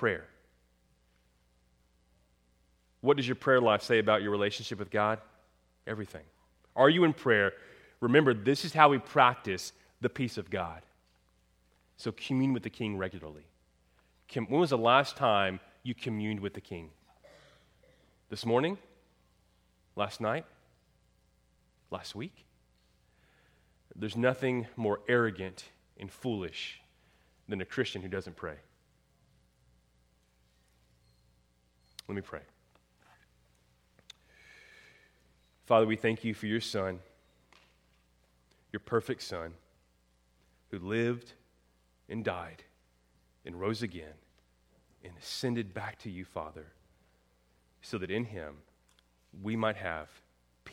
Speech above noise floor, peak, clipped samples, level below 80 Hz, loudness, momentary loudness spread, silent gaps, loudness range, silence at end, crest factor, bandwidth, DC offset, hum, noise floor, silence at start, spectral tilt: 39 dB; -4 dBFS; under 0.1%; -68 dBFS; -31 LUFS; 21 LU; none; 15 LU; 0 s; 30 dB; 16 kHz; under 0.1%; none; -70 dBFS; 0 s; -5.5 dB/octave